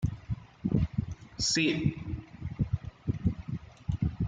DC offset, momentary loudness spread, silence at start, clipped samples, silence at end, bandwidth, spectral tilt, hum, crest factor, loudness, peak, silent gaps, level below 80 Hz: under 0.1%; 14 LU; 0 s; under 0.1%; 0 s; 9.4 kHz; -5 dB/octave; none; 18 dB; -32 LUFS; -14 dBFS; none; -44 dBFS